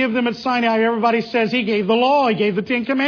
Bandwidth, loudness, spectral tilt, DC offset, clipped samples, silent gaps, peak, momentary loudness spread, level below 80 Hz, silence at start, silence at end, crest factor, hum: 5.4 kHz; -18 LUFS; -6.5 dB/octave; under 0.1%; under 0.1%; none; -4 dBFS; 4 LU; -62 dBFS; 0 s; 0 s; 14 dB; none